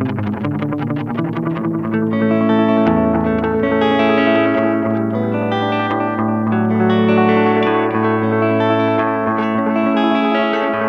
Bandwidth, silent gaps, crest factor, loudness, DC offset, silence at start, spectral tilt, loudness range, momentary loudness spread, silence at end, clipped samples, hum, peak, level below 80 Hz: 6 kHz; none; 14 dB; -16 LUFS; 0.1%; 0 s; -8.5 dB/octave; 2 LU; 7 LU; 0 s; under 0.1%; none; -2 dBFS; -46 dBFS